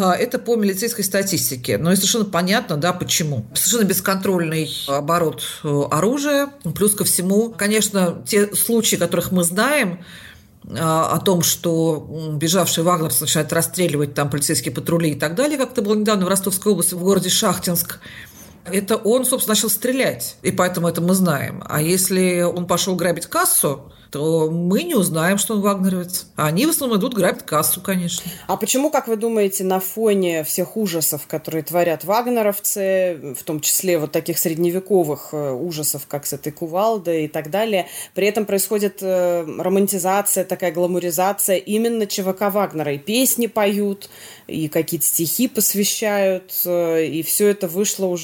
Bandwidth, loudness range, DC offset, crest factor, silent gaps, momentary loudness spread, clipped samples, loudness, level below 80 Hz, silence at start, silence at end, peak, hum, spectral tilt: 17 kHz; 2 LU; under 0.1%; 14 dB; none; 7 LU; under 0.1%; -19 LUFS; -56 dBFS; 0 s; 0 s; -6 dBFS; none; -4 dB/octave